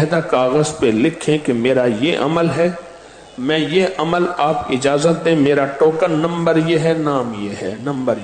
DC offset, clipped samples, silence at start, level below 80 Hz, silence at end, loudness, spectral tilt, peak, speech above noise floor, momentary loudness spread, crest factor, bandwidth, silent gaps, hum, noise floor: under 0.1%; under 0.1%; 0 s; -52 dBFS; 0 s; -17 LUFS; -6 dB/octave; -4 dBFS; 23 dB; 7 LU; 12 dB; 9.4 kHz; none; none; -39 dBFS